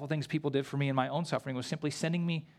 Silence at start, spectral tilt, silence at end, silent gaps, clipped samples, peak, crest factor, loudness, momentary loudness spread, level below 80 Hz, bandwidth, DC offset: 0 s; -6 dB/octave; 0.15 s; none; under 0.1%; -14 dBFS; 18 dB; -33 LUFS; 4 LU; -74 dBFS; 13 kHz; under 0.1%